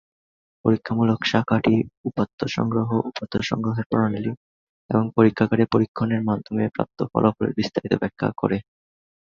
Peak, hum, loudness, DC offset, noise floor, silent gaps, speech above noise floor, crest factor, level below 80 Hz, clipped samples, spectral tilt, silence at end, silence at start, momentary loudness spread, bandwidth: -2 dBFS; none; -23 LUFS; under 0.1%; under -90 dBFS; 1.97-2.04 s, 2.33-2.38 s, 3.86-3.90 s, 4.37-4.89 s, 5.88-5.95 s; over 68 dB; 20 dB; -52 dBFS; under 0.1%; -7.5 dB/octave; 0.75 s; 0.65 s; 7 LU; 7.2 kHz